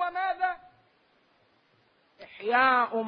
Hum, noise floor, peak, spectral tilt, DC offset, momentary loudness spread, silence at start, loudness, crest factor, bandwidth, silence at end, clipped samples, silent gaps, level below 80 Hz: none; -66 dBFS; -10 dBFS; -6.5 dB/octave; under 0.1%; 19 LU; 0 s; -26 LUFS; 20 dB; 5.4 kHz; 0 s; under 0.1%; none; -72 dBFS